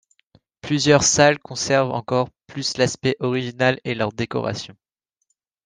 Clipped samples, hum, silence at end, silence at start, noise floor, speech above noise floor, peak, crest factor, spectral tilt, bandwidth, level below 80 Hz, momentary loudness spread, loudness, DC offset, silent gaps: under 0.1%; none; 0.95 s; 0.65 s; -73 dBFS; 53 dB; -2 dBFS; 20 dB; -4 dB/octave; 10 kHz; -54 dBFS; 13 LU; -20 LUFS; under 0.1%; none